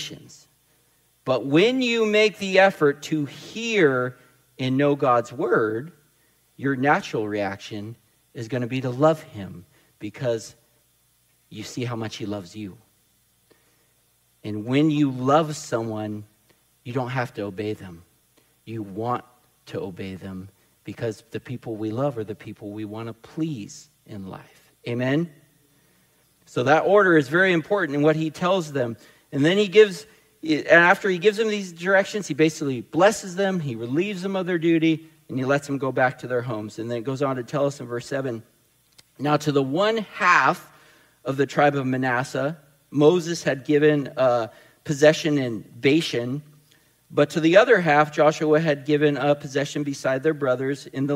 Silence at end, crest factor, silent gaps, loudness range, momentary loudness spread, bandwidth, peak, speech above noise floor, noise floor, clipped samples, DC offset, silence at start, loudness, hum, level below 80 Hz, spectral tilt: 0 s; 22 dB; none; 12 LU; 18 LU; 16 kHz; -2 dBFS; 42 dB; -64 dBFS; under 0.1%; under 0.1%; 0 s; -22 LUFS; none; -68 dBFS; -5.5 dB/octave